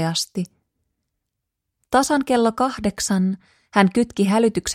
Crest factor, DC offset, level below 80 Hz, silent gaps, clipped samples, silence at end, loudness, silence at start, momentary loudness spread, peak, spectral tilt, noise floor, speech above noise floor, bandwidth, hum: 20 dB; under 0.1%; -50 dBFS; none; under 0.1%; 0 s; -20 LUFS; 0 s; 9 LU; -2 dBFS; -4.5 dB/octave; -80 dBFS; 60 dB; 16 kHz; none